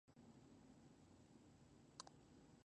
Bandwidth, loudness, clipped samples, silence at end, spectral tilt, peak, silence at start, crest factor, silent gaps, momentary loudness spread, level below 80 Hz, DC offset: 9 kHz; -66 LUFS; under 0.1%; 0 s; -4 dB/octave; -34 dBFS; 0.05 s; 32 dB; none; 8 LU; -82 dBFS; under 0.1%